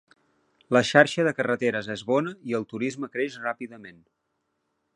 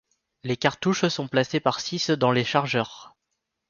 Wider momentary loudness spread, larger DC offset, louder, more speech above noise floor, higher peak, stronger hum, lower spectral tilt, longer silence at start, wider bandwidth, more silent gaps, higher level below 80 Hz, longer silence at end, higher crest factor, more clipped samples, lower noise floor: first, 13 LU vs 7 LU; neither; about the same, -25 LUFS vs -24 LUFS; second, 52 dB vs 56 dB; about the same, -2 dBFS vs -4 dBFS; neither; about the same, -5 dB/octave vs -5 dB/octave; first, 0.7 s vs 0.45 s; first, 11 kHz vs 7.2 kHz; neither; second, -70 dBFS vs -64 dBFS; first, 1.05 s vs 0.6 s; about the same, 26 dB vs 22 dB; neither; about the same, -77 dBFS vs -80 dBFS